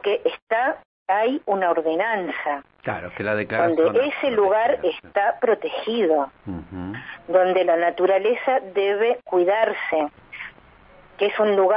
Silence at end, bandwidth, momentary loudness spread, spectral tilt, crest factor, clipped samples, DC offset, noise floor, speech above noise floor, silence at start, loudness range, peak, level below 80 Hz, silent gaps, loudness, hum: 0 s; 5.2 kHz; 14 LU; -9.5 dB/octave; 16 dB; under 0.1%; under 0.1%; -50 dBFS; 29 dB; 0 s; 3 LU; -6 dBFS; -60 dBFS; 0.42-0.47 s, 0.85-1.06 s; -22 LUFS; none